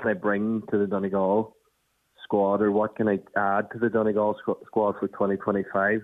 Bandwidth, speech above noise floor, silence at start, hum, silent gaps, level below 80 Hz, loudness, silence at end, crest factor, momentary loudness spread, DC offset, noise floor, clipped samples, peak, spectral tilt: 3.9 kHz; 46 dB; 0 s; none; none; -64 dBFS; -25 LUFS; 0 s; 16 dB; 4 LU; under 0.1%; -70 dBFS; under 0.1%; -10 dBFS; -9.5 dB/octave